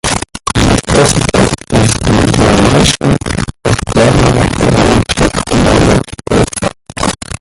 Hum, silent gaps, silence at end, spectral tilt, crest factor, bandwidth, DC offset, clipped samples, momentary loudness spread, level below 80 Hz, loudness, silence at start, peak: none; none; 0.05 s; -5 dB/octave; 10 dB; 16 kHz; under 0.1%; under 0.1%; 8 LU; -22 dBFS; -10 LUFS; 0.05 s; 0 dBFS